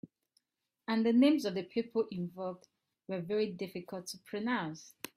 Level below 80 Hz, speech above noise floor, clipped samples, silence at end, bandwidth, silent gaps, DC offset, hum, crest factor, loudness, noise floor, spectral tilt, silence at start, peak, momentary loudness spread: -78 dBFS; 49 dB; under 0.1%; 0.3 s; 15.5 kHz; none; under 0.1%; none; 18 dB; -34 LUFS; -82 dBFS; -5.5 dB/octave; 0.05 s; -16 dBFS; 16 LU